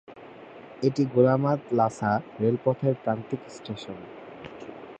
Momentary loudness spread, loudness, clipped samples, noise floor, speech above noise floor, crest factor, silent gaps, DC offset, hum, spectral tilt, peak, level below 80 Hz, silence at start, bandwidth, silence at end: 22 LU; -26 LUFS; under 0.1%; -45 dBFS; 20 dB; 20 dB; none; under 0.1%; none; -8 dB/octave; -8 dBFS; -64 dBFS; 0.1 s; 9 kHz; 0.05 s